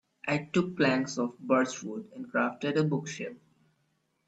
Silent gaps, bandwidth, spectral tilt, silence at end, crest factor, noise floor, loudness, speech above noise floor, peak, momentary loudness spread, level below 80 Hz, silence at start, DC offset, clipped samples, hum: none; 8.6 kHz; -5.5 dB/octave; 0.9 s; 18 dB; -75 dBFS; -30 LUFS; 45 dB; -12 dBFS; 12 LU; -72 dBFS; 0.25 s; under 0.1%; under 0.1%; none